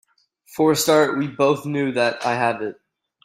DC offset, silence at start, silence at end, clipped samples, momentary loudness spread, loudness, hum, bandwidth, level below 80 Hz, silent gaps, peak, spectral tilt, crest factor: under 0.1%; 0.5 s; 0.5 s; under 0.1%; 10 LU; -20 LUFS; none; 16 kHz; -64 dBFS; none; -4 dBFS; -4.5 dB/octave; 16 dB